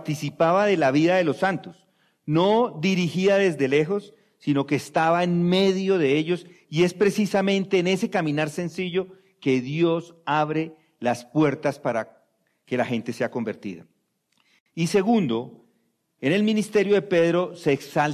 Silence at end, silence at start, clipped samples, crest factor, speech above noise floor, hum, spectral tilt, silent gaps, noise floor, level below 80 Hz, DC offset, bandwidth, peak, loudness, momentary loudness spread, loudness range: 0 s; 0 s; under 0.1%; 14 dB; 47 dB; none; -6 dB/octave; 14.61-14.66 s; -70 dBFS; -66 dBFS; under 0.1%; 14 kHz; -10 dBFS; -23 LUFS; 10 LU; 5 LU